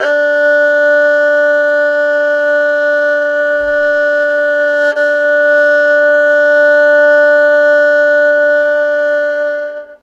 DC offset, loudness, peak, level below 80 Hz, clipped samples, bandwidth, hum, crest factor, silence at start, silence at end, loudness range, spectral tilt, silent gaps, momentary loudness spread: under 0.1%; -10 LUFS; 0 dBFS; -56 dBFS; under 0.1%; 7.4 kHz; none; 10 dB; 0 s; 0.1 s; 3 LU; -2.5 dB/octave; none; 5 LU